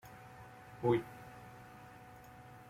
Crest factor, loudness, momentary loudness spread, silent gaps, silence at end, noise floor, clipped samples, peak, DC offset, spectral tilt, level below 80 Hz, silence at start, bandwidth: 22 dB; -36 LUFS; 21 LU; none; 0.05 s; -55 dBFS; under 0.1%; -20 dBFS; under 0.1%; -7.5 dB/octave; -68 dBFS; 0.05 s; 16 kHz